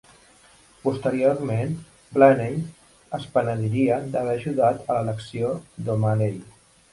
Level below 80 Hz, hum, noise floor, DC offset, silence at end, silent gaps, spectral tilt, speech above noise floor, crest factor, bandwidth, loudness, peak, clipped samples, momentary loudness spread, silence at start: -58 dBFS; none; -54 dBFS; under 0.1%; 0.45 s; none; -8 dB/octave; 32 dB; 20 dB; 11.5 kHz; -23 LUFS; -4 dBFS; under 0.1%; 14 LU; 0.85 s